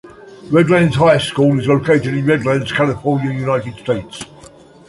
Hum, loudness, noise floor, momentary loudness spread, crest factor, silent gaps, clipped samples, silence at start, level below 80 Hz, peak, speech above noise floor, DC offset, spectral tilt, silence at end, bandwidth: none; -15 LUFS; -41 dBFS; 10 LU; 14 dB; none; under 0.1%; 0.05 s; -46 dBFS; -2 dBFS; 27 dB; under 0.1%; -6.5 dB/octave; 0.65 s; 11.5 kHz